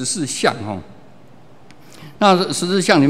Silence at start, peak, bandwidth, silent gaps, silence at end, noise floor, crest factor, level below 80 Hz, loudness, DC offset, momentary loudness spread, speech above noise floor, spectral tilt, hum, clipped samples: 0 s; 0 dBFS; 15.5 kHz; none; 0 s; -46 dBFS; 18 dB; -60 dBFS; -17 LUFS; 0.8%; 14 LU; 30 dB; -4 dB/octave; none; under 0.1%